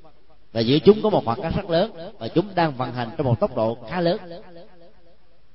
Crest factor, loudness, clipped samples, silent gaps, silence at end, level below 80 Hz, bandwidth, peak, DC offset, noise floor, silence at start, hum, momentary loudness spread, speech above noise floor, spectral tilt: 22 dB; -22 LUFS; under 0.1%; none; 0.9 s; -48 dBFS; 5.8 kHz; 0 dBFS; 0.8%; -58 dBFS; 0.55 s; none; 13 LU; 36 dB; -10.5 dB/octave